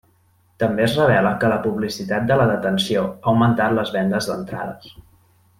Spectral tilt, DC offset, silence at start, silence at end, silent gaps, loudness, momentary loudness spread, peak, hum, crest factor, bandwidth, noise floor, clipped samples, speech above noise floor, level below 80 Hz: -6 dB/octave; under 0.1%; 0.6 s; 0.7 s; none; -19 LUFS; 10 LU; -4 dBFS; none; 16 dB; 16 kHz; -59 dBFS; under 0.1%; 40 dB; -50 dBFS